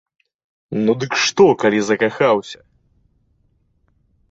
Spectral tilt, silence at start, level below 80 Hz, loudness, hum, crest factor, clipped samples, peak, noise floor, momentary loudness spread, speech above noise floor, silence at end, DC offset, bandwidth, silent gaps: -4.5 dB/octave; 0.7 s; -58 dBFS; -16 LUFS; none; 18 dB; under 0.1%; -2 dBFS; -62 dBFS; 14 LU; 46 dB; 1.75 s; under 0.1%; 7.8 kHz; none